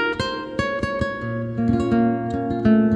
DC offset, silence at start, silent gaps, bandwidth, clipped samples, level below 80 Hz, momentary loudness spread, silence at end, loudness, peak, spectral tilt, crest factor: under 0.1%; 0 s; none; 10 kHz; under 0.1%; -42 dBFS; 7 LU; 0 s; -22 LUFS; -6 dBFS; -7 dB/octave; 14 dB